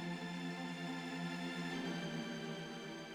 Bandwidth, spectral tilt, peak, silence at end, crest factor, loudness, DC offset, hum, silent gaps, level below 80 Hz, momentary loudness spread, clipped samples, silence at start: 15 kHz; -5 dB/octave; -32 dBFS; 0 s; 12 dB; -44 LUFS; under 0.1%; none; none; -78 dBFS; 4 LU; under 0.1%; 0 s